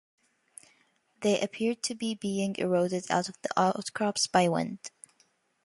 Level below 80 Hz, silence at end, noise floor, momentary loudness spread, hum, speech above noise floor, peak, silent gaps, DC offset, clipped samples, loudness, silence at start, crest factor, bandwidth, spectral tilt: -72 dBFS; 0.75 s; -69 dBFS; 7 LU; none; 40 dB; -10 dBFS; none; under 0.1%; under 0.1%; -29 LUFS; 1.2 s; 20 dB; 11.5 kHz; -4 dB/octave